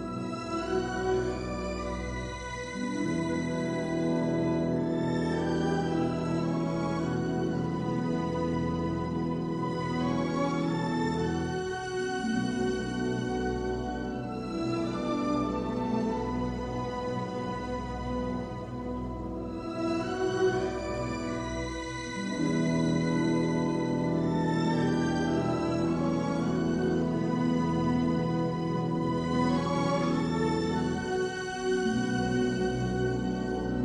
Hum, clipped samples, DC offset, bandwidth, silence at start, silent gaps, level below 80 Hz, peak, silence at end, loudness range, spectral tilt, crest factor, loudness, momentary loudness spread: none; under 0.1%; under 0.1%; 10.5 kHz; 0 s; none; -48 dBFS; -14 dBFS; 0 s; 4 LU; -6.5 dB/octave; 14 dB; -30 LUFS; 7 LU